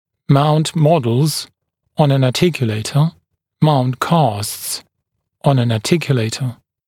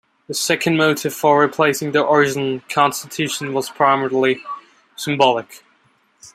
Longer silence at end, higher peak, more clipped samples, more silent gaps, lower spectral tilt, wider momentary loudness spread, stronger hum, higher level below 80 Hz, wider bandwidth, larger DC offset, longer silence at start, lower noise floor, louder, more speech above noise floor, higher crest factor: first, 0.35 s vs 0.05 s; about the same, 0 dBFS vs -2 dBFS; neither; neither; first, -6 dB/octave vs -4 dB/octave; about the same, 10 LU vs 10 LU; neither; first, -54 dBFS vs -64 dBFS; about the same, 16.5 kHz vs 16 kHz; neither; about the same, 0.3 s vs 0.3 s; first, -74 dBFS vs -59 dBFS; about the same, -16 LUFS vs -18 LUFS; first, 59 dB vs 42 dB; about the same, 16 dB vs 18 dB